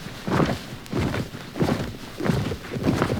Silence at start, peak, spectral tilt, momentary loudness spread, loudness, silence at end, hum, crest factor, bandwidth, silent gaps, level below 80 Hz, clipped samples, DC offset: 0 s; -4 dBFS; -6.5 dB/octave; 8 LU; -26 LUFS; 0 s; none; 20 dB; over 20 kHz; none; -42 dBFS; under 0.1%; under 0.1%